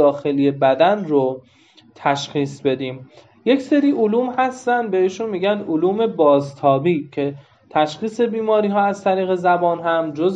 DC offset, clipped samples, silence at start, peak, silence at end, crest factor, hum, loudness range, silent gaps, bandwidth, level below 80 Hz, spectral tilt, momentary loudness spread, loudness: under 0.1%; under 0.1%; 0 s; -2 dBFS; 0 s; 16 dB; none; 2 LU; none; 8 kHz; -70 dBFS; -6.5 dB/octave; 8 LU; -19 LUFS